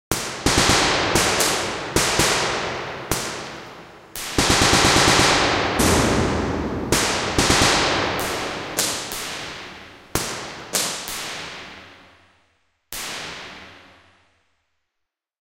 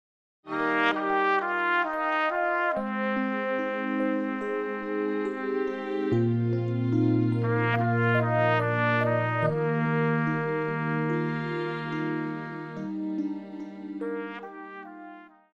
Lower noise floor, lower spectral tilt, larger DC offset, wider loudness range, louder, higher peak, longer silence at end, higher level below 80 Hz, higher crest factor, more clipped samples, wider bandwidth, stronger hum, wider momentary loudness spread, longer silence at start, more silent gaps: first, -81 dBFS vs -47 dBFS; second, -2.5 dB/octave vs -8.5 dB/octave; neither; first, 16 LU vs 8 LU; first, -19 LUFS vs -27 LUFS; first, -2 dBFS vs -10 dBFS; first, 1.65 s vs 0.25 s; first, -38 dBFS vs -68 dBFS; about the same, 20 dB vs 16 dB; neither; first, 16.5 kHz vs 6.6 kHz; neither; first, 19 LU vs 11 LU; second, 0.1 s vs 0.45 s; neither